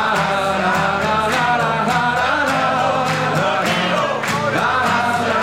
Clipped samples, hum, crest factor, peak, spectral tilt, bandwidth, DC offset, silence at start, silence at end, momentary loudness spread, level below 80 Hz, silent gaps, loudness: under 0.1%; none; 14 dB; -4 dBFS; -4.5 dB/octave; 16.5 kHz; 0.2%; 0 s; 0 s; 1 LU; -48 dBFS; none; -17 LUFS